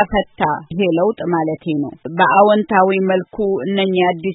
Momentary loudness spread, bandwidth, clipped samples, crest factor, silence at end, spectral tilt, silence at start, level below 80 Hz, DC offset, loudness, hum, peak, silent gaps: 8 LU; 4 kHz; under 0.1%; 16 dB; 0 s; -11.5 dB/octave; 0 s; -44 dBFS; under 0.1%; -16 LUFS; none; 0 dBFS; none